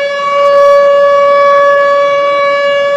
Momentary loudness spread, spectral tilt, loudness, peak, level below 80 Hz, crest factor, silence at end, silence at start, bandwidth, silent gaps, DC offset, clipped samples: 4 LU; -2.5 dB/octave; -7 LUFS; 0 dBFS; -54 dBFS; 8 dB; 0 s; 0 s; 7.8 kHz; none; under 0.1%; 0.5%